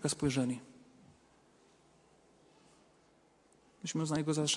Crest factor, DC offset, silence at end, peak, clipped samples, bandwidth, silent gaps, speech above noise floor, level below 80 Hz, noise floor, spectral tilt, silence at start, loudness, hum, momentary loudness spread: 20 dB; under 0.1%; 0 s; -18 dBFS; under 0.1%; 11.5 kHz; none; 34 dB; -68 dBFS; -68 dBFS; -4.5 dB/octave; 0 s; -35 LUFS; none; 20 LU